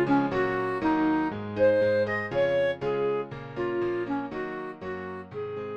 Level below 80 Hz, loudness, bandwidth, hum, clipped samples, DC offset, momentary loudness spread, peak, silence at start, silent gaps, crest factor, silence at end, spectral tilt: -58 dBFS; -28 LUFS; 7 kHz; none; under 0.1%; under 0.1%; 12 LU; -12 dBFS; 0 s; none; 14 dB; 0 s; -8 dB/octave